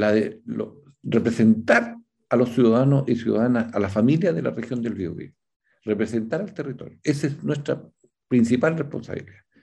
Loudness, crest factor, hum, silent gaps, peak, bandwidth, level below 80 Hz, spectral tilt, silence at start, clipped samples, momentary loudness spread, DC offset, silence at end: -23 LUFS; 20 dB; none; 5.56-5.60 s; -4 dBFS; 10.5 kHz; -62 dBFS; -7.5 dB/octave; 0 s; under 0.1%; 14 LU; under 0.1%; 0.3 s